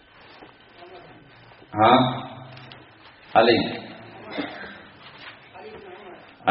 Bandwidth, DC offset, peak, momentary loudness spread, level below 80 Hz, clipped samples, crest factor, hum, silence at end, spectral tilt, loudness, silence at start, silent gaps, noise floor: 5.8 kHz; under 0.1%; -2 dBFS; 27 LU; -60 dBFS; under 0.1%; 24 dB; none; 0 s; -3.5 dB/octave; -22 LUFS; 0.9 s; none; -49 dBFS